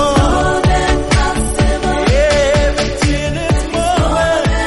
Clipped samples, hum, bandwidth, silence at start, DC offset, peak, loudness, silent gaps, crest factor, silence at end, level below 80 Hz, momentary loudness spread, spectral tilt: under 0.1%; none; 11.5 kHz; 0 s; under 0.1%; 0 dBFS; -14 LUFS; none; 12 dB; 0 s; -20 dBFS; 4 LU; -5 dB/octave